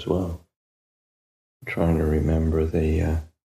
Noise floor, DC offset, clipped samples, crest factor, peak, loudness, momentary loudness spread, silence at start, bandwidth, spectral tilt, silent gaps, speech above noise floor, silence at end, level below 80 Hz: under -90 dBFS; under 0.1%; under 0.1%; 16 dB; -10 dBFS; -24 LUFS; 10 LU; 0 s; 12.5 kHz; -8.5 dB/octave; 0.56-1.60 s; over 68 dB; 0.2 s; -32 dBFS